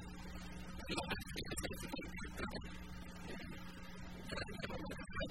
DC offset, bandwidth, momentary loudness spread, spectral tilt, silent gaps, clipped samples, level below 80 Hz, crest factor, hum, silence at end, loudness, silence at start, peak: 0.2%; 16 kHz; 8 LU; -4 dB/octave; none; under 0.1%; -54 dBFS; 20 dB; none; 0 s; -47 LUFS; 0 s; -26 dBFS